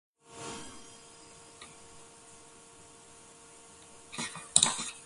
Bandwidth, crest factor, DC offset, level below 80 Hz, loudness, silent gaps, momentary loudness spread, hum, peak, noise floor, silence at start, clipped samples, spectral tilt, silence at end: 12 kHz; 36 dB; under 0.1%; -68 dBFS; -30 LUFS; none; 27 LU; none; -2 dBFS; -55 dBFS; 0.3 s; under 0.1%; 0 dB/octave; 0 s